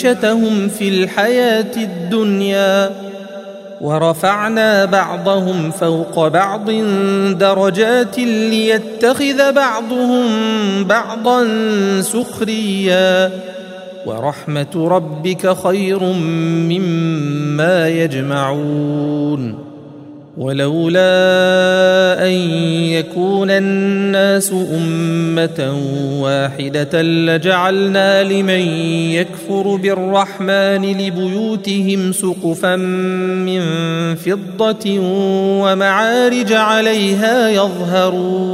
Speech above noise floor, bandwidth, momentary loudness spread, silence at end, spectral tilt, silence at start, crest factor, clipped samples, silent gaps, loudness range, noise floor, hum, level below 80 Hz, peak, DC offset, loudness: 21 dB; 16 kHz; 7 LU; 0 s; -5.5 dB/octave; 0 s; 14 dB; under 0.1%; none; 4 LU; -35 dBFS; none; -62 dBFS; 0 dBFS; under 0.1%; -14 LUFS